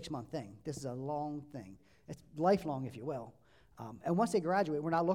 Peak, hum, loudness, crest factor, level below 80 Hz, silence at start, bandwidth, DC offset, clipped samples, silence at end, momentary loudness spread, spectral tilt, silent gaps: -18 dBFS; none; -36 LUFS; 18 dB; -68 dBFS; 0 s; 16 kHz; under 0.1%; under 0.1%; 0 s; 19 LU; -6.5 dB/octave; none